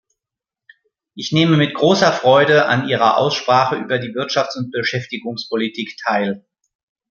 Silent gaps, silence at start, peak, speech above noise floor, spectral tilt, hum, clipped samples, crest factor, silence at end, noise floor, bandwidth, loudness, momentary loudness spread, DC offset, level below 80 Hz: none; 1.15 s; -2 dBFS; 70 dB; -5.5 dB/octave; none; under 0.1%; 16 dB; 0.7 s; -86 dBFS; 7.2 kHz; -17 LUFS; 11 LU; under 0.1%; -62 dBFS